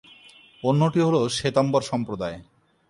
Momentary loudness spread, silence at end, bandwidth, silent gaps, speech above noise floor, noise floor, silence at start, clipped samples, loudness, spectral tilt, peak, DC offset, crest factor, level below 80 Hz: 11 LU; 0.45 s; 11.5 kHz; none; 29 dB; -51 dBFS; 0.65 s; under 0.1%; -23 LUFS; -6 dB/octave; -6 dBFS; under 0.1%; 18 dB; -56 dBFS